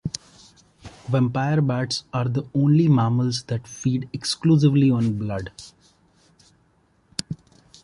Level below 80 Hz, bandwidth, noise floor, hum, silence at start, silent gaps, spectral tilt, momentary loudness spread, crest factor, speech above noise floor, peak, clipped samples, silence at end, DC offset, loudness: -54 dBFS; 11.5 kHz; -62 dBFS; none; 0.05 s; none; -6.5 dB/octave; 17 LU; 18 dB; 41 dB; -4 dBFS; under 0.1%; 0.5 s; under 0.1%; -22 LUFS